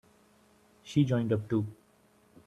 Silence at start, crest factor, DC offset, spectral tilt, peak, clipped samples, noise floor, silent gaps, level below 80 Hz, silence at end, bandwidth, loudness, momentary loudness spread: 0.85 s; 20 dB; under 0.1%; -8 dB/octave; -14 dBFS; under 0.1%; -65 dBFS; none; -66 dBFS; 0.75 s; 12 kHz; -30 LUFS; 5 LU